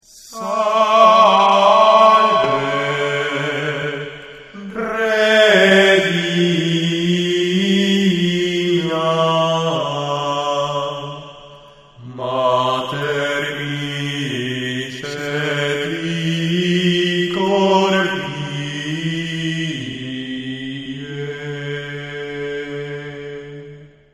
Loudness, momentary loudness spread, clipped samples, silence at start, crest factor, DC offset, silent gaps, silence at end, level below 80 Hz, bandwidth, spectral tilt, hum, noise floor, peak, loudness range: -17 LUFS; 17 LU; under 0.1%; 0.15 s; 18 dB; under 0.1%; none; 0.25 s; -56 dBFS; 14.5 kHz; -5 dB/octave; none; -43 dBFS; 0 dBFS; 11 LU